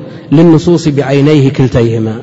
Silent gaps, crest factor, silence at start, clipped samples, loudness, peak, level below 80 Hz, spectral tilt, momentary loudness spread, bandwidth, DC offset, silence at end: none; 8 dB; 0 s; 2%; -8 LUFS; 0 dBFS; -36 dBFS; -8 dB/octave; 5 LU; 8 kHz; under 0.1%; 0 s